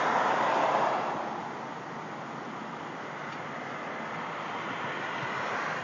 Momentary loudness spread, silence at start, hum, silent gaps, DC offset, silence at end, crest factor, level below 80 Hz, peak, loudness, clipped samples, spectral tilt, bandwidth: 12 LU; 0 s; none; none; under 0.1%; 0 s; 18 dB; -76 dBFS; -14 dBFS; -32 LUFS; under 0.1%; -4.5 dB/octave; 7.6 kHz